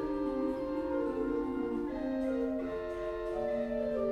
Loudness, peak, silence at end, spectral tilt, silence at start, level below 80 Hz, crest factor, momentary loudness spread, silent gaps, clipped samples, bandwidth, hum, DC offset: -35 LUFS; -22 dBFS; 0 s; -7.5 dB/octave; 0 s; -52 dBFS; 12 dB; 3 LU; none; under 0.1%; 9.8 kHz; none; under 0.1%